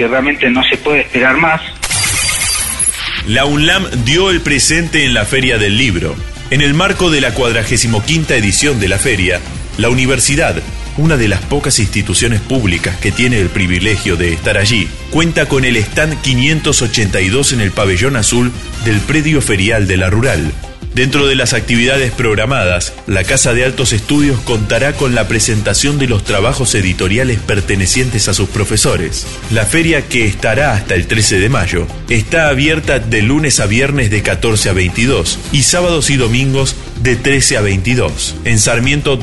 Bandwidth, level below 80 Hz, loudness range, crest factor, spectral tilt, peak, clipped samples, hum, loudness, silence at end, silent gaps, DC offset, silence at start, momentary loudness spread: 12 kHz; -26 dBFS; 2 LU; 12 dB; -4 dB/octave; 0 dBFS; under 0.1%; none; -12 LUFS; 0 s; none; 3%; 0 s; 5 LU